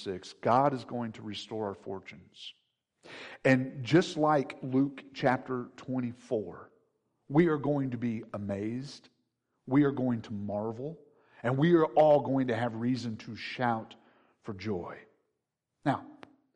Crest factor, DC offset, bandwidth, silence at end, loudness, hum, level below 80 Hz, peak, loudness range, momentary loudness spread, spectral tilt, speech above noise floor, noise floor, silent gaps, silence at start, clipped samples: 18 dB; under 0.1%; 10 kHz; 0.45 s; -30 LUFS; none; -72 dBFS; -12 dBFS; 6 LU; 19 LU; -7 dB/octave; 55 dB; -85 dBFS; none; 0 s; under 0.1%